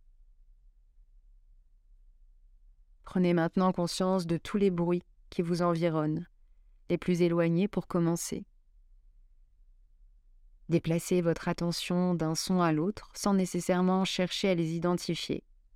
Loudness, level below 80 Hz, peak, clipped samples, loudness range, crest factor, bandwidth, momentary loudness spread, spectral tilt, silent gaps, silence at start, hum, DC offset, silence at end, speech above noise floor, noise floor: -30 LUFS; -58 dBFS; -14 dBFS; under 0.1%; 6 LU; 18 dB; 15.5 kHz; 8 LU; -6 dB/octave; none; 3.05 s; none; under 0.1%; 0.35 s; 31 dB; -60 dBFS